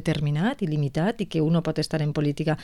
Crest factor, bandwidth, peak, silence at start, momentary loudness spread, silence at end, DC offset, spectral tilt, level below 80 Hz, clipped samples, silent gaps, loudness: 12 dB; 12 kHz; -12 dBFS; 0 s; 3 LU; 0 s; 0.4%; -7 dB/octave; -50 dBFS; under 0.1%; none; -25 LUFS